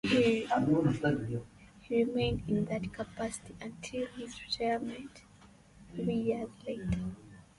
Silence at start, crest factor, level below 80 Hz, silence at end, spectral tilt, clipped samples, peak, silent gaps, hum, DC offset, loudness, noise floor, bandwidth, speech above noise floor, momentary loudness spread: 0.05 s; 18 dB; -54 dBFS; 0.15 s; -6 dB/octave; under 0.1%; -16 dBFS; none; none; under 0.1%; -33 LUFS; -58 dBFS; 11.5 kHz; 25 dB; 15 LU